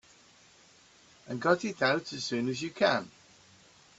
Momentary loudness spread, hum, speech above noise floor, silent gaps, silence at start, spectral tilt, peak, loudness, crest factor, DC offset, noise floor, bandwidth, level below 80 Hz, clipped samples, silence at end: 6 LU; none; 30 dB; none; 1.25 s; -4.5 dB/octave; -12 dBFS; -30 LUFS; 22 dB; under 0.1%; -60 dBFS; 8.2 kHz; -72 dBFS; under 0.1%; 0.9 s